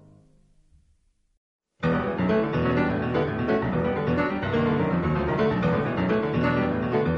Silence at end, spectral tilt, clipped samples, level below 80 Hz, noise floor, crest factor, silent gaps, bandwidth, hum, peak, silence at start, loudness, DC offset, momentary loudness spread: 0 s; -9 dB/octave; under 0.1%; -44 dBFS; -65 dBFS; 12 dB; none; 6.8 kHz; none; -12 dBFS; 1.8 s; -25 LUFS; under 0.1%; 2 LU